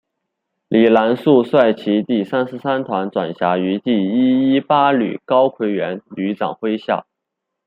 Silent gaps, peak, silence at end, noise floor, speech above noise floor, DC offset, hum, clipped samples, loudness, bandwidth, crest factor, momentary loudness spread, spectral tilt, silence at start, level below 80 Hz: none; -2 dBFS; 0.65 s; -79 dBFS; 63 dB; under 0.1%; none; under 0.1%; -17 LUFS; 5 kHz; 16 dB; 9 LU; -8.5 dB/octave; 0.7 s; -64 dBFS